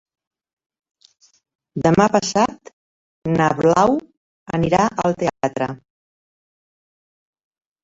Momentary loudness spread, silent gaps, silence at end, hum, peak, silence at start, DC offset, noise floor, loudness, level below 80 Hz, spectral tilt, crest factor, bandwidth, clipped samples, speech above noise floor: 12 LU; 2.73-3.22 s, 4.17-4.46 s; 2.05 s; none; -2 dBFS; 1.75 s; under 0.1%; under -90 dBFS; -18 LUFS; -52 dBFS; -6 dB/octave; 20 dB; 8 kHz; under 0.1%; over 73 dB